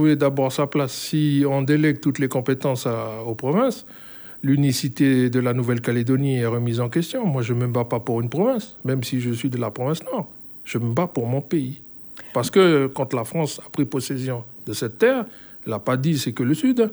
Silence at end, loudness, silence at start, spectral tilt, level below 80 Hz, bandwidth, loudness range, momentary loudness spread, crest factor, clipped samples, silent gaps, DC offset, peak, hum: 0 s; -22 LUFS; 0 s; -6.5 dB/octave; -64 dBFS; over 20 kHz; 4 LU; 10 LU; 18 dB; under 0.1%; none; under 0.1%; -4 dBFS; none